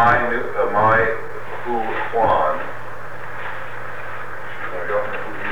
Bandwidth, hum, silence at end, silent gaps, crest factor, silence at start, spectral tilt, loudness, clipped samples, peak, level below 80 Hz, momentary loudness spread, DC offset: over 20 kHz; none; 0 s; none; 16 dB; 0 s; -6.5 dB/octave; -22 LUFS; under 0.1%; -4 dBFS; -46 dBFS; 16 LU; 6%